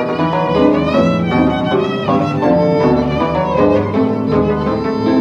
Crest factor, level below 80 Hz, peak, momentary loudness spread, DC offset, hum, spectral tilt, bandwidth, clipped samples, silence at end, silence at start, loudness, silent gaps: 12 dB; -36 dBFS; 0 dBFS; 3 LU; under 0.1%; none; -8 dB/octave; 7.6 kHz; under 0.1%; 0 s; 0 s; -14 LUFS; none